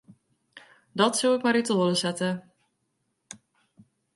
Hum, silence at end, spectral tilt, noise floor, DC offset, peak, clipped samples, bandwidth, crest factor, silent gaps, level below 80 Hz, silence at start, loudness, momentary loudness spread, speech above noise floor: none; 1.75 s; -4 dB/octave; -76 dBFS; under 0.1%; -6 dBFS; under 0.1%; 11.5 kHz; 22 dB; none; -74 dBFS; 0.55 s; -25 LUFS; 24 LU; 52 dB